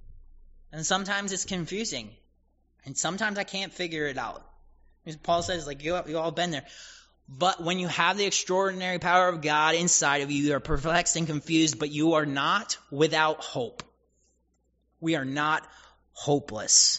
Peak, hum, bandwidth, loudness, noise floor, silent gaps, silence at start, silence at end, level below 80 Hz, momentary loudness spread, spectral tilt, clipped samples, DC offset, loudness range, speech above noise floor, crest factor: -6 dBFS; none; 8 kHz; -26 LUFS; -71 dBFS; none; 0.05 s; 0 s; -50 dBFS; 13 LU; -2.5 dB/octave; under 0.1%; under 0.1%; 8 LU; 44 dB; 22 dB